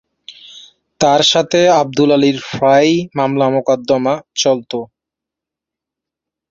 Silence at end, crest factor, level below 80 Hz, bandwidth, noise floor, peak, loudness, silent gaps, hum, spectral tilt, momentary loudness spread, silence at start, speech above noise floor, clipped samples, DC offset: 1.65 s; 14 dB; -56 dBFS; 7.8 kHz; -84 dBFS; 0 dBFS; -13 LUFS; none; none; -4.5 dB/octave; 7 LU; 0.3 s; 71 dB; under 0.1%; under 0.1%